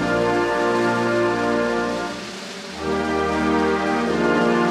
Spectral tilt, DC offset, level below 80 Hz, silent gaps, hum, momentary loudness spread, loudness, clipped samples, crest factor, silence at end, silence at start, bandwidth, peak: -5.5 dB/octave; under 0.1%; -46 dBFS; none; none; 10 LU; -21 LUFS; under 0.1%; 14 dB; 0 s; 0 s; 13.5 kHz; -8 dBFS